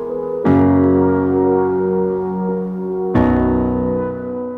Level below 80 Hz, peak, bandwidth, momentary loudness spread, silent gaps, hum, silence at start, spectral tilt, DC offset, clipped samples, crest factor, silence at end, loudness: -36 dBFS; -2 dBFS; 4.1 kHz; 9 LU; none; none; 0 s; -11 dB/octave; under 0.1%; under 0.1%; 14 dB; 0 s; -16 LUFS